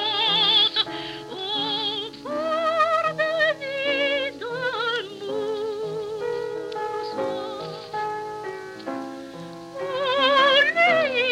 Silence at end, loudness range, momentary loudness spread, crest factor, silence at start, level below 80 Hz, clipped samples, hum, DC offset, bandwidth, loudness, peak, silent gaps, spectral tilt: 0 s; 9 LU; 17 LU; 18 dB; 0 s; -64 dBFS; under 0.1%; none; under 0.1%; 14.5 kHz; -23 LUFS; -6 dBFS; none; -3 dB/octave